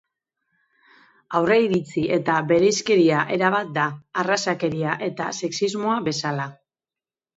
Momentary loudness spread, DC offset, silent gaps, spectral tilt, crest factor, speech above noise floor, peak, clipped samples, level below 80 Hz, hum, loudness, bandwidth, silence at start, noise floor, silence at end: 8 LU; under 0.1%; none; -5 dB/octave; 18 dB; over 69 dB; -4 dBFS; under 0.1%; -62 dBFS; none; -22 LUFS; 8 kHz; 1.3 s; under -90 dBFS; 0.85 s